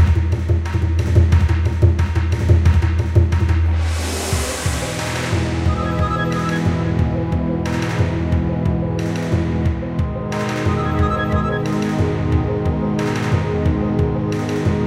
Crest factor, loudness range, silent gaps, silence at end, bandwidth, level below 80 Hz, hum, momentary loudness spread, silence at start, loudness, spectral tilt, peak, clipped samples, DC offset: 16 dB; 4 LU; none; 0 s; 13.5 kHz; -24 dBFS; none; 5 LU; 0 s; -19 LUFS; -6.5 dB/octave; 0 dBFS; under 0.1%; under 0.1%